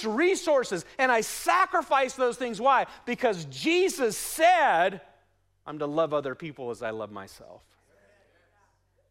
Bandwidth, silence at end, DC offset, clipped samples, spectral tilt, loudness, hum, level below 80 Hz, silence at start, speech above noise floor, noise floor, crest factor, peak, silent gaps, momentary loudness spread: 16 kHz; 1.55 s; under 0.1%; under 0.1%; -3.5 dB/octave; -26 LUFS; none; -66 dBFS; 0 s; 42 dB; -68 dBFS; 16 dB; -10 dBFS; none; 14 LU